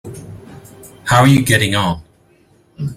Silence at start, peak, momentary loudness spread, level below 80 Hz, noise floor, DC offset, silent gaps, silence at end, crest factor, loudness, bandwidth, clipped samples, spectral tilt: 0.05 s; 0 dBFS; 24 LU; -44 dBFS; -52 dBFS; under 0.1%; none; 0 s; 16 dB; -13 LUFS; 16 kHz; under 0.1%; -5 dB/octave